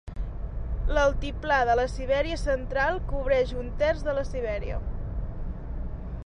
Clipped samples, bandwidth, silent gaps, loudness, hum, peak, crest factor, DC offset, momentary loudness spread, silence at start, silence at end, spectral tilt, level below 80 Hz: under 0.1%; 10.5 kHz; none; -28 LUFS; none; -12 dBFS; 16 dB; under 0.1%; 13 LU; 0.05 s; 0 s; -6 dB/octave; -32 dBFS